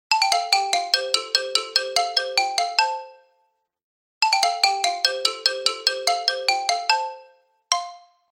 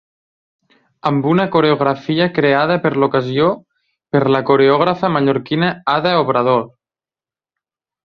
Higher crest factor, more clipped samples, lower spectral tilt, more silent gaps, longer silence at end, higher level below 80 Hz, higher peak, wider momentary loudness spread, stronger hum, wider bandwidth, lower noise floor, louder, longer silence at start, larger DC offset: first, 22 dB vs 16 dB; neither; second, 2.5 dB/octave vs -8.5 dB/octave; first, 3.83-4.21 s vs none; second, 0.35 s vs 1.4 s; second, -78 dBFS vs -56 dBFS; about the same, -2 dBFS vs 0 dBFS; about the same, 6 LU vs 5 LU; neither; first, 16.5 kHz vs 6.4 kHz; second, -70 dBFS vs under -90 dBFS; second, -21 LUFS vs -15 LUFS; second, 0.1 s vs 1.05 s; neither